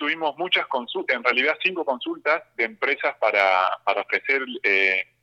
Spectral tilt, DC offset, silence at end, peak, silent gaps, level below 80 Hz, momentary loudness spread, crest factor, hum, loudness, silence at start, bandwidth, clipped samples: -3.5 dB/octave; under 0.1%; 0.2 s; -4 dBFS; none; -80 dBFS; 7 LU; 20 dB; none; -22 LUFS; 0 s; 8.8 kHz; under 0.1%